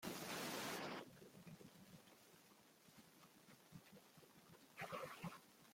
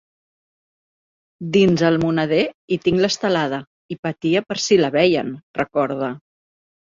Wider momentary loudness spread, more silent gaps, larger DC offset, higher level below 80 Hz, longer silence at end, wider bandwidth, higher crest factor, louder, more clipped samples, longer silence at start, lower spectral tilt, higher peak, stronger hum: first, 19 LU vs 12 LU; second, none vs 2.54-2.68 s, 3.67-3.89 s, 3.99-4.03 s, 5.43-5.54 s; neither; second, -86 dBFS vs -56 dBFS; second, 0 s vs 0.75 s; first, 16.5 kHz vs 7.6 kHz; about the same, 20 dB vs 18 dB; second, -52 LUFS vs -19 LUFS; neither; second, 0 s vs 1.4 s; second, -3.5 dB/octave vs -5.5 dB/octave; second, -36 dBFS vs -4 dBFS; neither